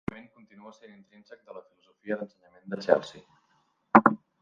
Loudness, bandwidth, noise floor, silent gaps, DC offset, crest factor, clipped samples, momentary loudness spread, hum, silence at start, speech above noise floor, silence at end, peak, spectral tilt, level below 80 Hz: -25 LUFS; 7.4 kHz; -70 dBFS; none; under 0.1%; 28 dB; under 0.1%; 27 LU; none; 0.65 s; 37 dB; 0.25 s; -2 dBFS; -7 dB/octave; -66 dBFS